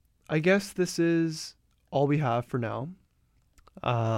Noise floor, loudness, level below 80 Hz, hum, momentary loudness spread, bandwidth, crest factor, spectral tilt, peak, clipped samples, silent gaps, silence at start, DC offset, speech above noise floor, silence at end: -68 dBFS; -28 LUFS; -62 dBFS; none; 12 LU; 16 kHz; 18 dB; -6 dB/octave; -10 dBFS; under 0.1%; none; 0.3 s; under 0.1%; 41 dB; 0 s